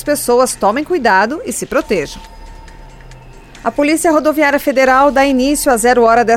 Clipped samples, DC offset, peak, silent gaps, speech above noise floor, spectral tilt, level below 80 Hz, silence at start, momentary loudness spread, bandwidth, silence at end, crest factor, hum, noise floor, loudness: under 0.1%; under 0.1%; 0 dBFS; none; 24 dB; -3.5 dB/octave; -38 dBFS; 0 s; 9 LU; 17 kHz; 0 s; 14 dB; none; -36 dBFS; -12 LUFS